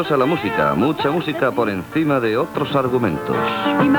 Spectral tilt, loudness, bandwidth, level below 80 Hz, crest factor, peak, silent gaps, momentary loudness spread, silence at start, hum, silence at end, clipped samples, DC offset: -7 dB/octave; -19 LUFS; over 20 kHz; -50 dBFS; 14 dB; -4 dBFS; none; 3 LU; 0 s; none; 0 s; under 0.1%; under 0.1%